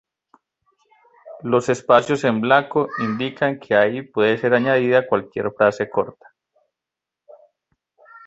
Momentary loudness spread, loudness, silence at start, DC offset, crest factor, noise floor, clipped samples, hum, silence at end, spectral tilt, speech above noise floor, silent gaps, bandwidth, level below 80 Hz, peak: 7 LU; -19 LUFS; 1.25 s; under 0.1%; 20 dB; -86 dBFS; under 0.1%; none; 0.1 s; -6 dB/octave; 67 dB; none; 8.2 kHz; -62 dBFS; -2 dBFS